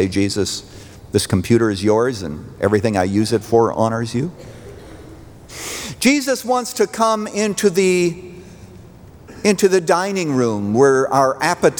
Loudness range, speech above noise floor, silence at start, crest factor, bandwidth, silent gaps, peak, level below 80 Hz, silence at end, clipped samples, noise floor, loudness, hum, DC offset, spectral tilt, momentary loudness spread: 3 LU; 24 dB; 0 s; 16 dB; over 20 kHz; none; -2 dBFS; -50 dBFS; 0 s; under 0.1%; -41 dBFS; -17 LUFS; none; under 0.1%; -5 dB/octave; 15 LU